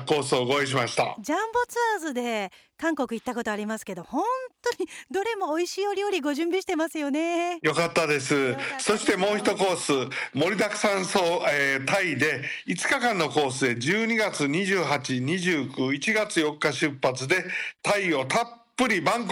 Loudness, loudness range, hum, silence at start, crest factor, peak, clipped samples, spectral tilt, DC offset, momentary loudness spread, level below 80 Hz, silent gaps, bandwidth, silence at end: -25 LUFS; 5 LU; none; 0 s; 14 dB; -12 dBFS; under 0.1%; -4 dB/octave; under 0.1%; 6 LU; -66 dBFS; none; 19.5 kHz; 0 s